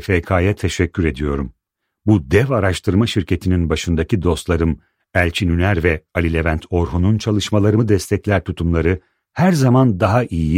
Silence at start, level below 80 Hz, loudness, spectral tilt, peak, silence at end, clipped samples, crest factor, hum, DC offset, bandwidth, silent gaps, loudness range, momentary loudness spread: 0 s; -30 dBFS; -17 LUFS; -6.5 dB/octave; -2 dBFS; 0 s; under 0.1%; 16 dB; none; under 0.1%; 15.5 kHz; none; 2 LU; 6 LU